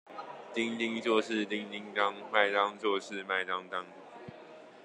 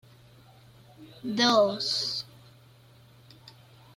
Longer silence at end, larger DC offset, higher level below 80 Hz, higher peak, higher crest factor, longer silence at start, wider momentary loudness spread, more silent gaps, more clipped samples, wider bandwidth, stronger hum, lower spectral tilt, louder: second, 0 s vs 0.45 s; neither; second, -86 dBFS vs -70 dBFS; about the same, -10 dBFS vs -10 dBFS; about the same, 24 dB vs 22 dB; second, 0.05 s vs 1 s; first, 20 LU vs 17 LU; neither; neither; second, 10.5 kHz vs 16 kHz; neither; about the same, -4 dB/octave vs -3 dB/octave; second, -32 LUFS vs -25 LUFS